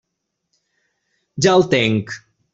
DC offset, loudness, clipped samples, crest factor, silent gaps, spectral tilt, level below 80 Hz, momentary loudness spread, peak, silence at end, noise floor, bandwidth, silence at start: under 0.1%; -16 LUFS; under 0.1%; 20 dB; none; -5 dB/octave; -56 dBFS; 20 LU; 0 dBFS; 0.35 s; -77 dBFS; 8 kHz; 1.35 s